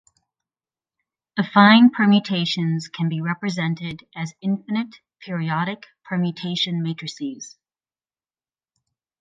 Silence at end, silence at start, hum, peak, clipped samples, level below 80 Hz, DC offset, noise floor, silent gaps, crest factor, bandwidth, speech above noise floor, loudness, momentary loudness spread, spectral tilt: 1.7 s; 1.35 s; none; 0 dBFS; under 0.1%; -68 dBFS; under 0.1%; under -90 dBFS; none; 22 dB; 7.6 kHz; over 70 dB; -21 LUFS; 18 LU; -6 dB/octave